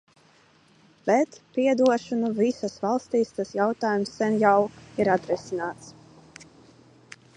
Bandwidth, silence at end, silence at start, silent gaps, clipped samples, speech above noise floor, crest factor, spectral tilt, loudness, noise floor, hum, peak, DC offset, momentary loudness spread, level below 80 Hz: 10 kHz; 1.45 s; 1.05 s; none; under 0.1%; 34 dB; 20 dB; -6 dB/octave; -25 LUFS; -59 dBFS; none; -6 dBFS; under 0.1%; 10 LU; -66 dBFS